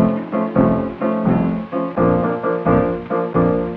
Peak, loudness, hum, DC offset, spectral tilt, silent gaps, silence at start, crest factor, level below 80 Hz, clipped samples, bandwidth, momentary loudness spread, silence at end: -2 dBFS; -18 LUFS; none; under 0.1%; -11.5 dB/octave; none; 0 s; 16 dB; -40 dBFS; under 0.1%; 4.5 kHz; 5 LU; 0 s